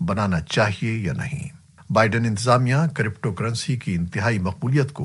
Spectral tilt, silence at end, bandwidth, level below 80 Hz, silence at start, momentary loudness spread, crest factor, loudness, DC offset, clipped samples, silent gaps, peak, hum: -6 dB/octave; 0 s; 11.5 kHz; -48 dBFS; 0 s; 8 LU; 20 dB; -22 LUFS; under 0.1%; under 0.1%; none; -2 dBFS; none